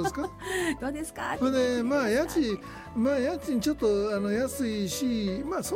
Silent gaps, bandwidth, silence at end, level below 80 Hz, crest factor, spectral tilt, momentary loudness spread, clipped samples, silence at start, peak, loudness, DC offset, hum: none; 16.5 kHz; 0 s; -50 dBFS; 12 dB; -4.5 dB/octave; 7 LU; under 0.1%; 0 s; -16 dBFS; -28 LUFS; under 0.1%; none